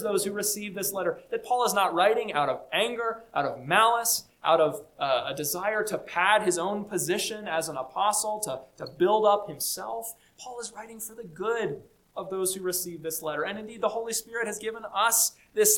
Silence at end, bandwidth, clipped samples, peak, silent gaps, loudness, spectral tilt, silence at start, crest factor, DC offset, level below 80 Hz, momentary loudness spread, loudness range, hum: 0 s; 19 kHz; under 0.1%; -6 dBFS; none; -27 LUFS; -2 dB/octave; 0 s; 20 dB; under 0.1%; -68 dBFS; 15 LU; 7 LU; none